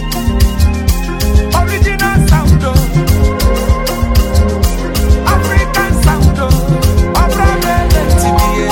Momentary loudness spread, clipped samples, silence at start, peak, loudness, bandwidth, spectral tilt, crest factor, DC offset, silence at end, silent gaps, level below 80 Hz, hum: 4 LU; under 0.1%; 0 s; 0 dBFS; -12 LUFS; 17 kHz; -5.5 dB/octave; 10 dB; 0.2%; 0 s; none; -12 dBFS; none